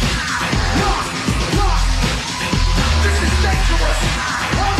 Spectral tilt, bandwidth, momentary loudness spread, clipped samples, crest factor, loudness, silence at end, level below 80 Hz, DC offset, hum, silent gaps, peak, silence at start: -4 dB/octave; 13.5 kHz; 3 LU; under 0.1%; 12 dB; -17 LUFS; 0 s; -20 dBFS; under 0.1%; none; none; -4 dBFS; 0 s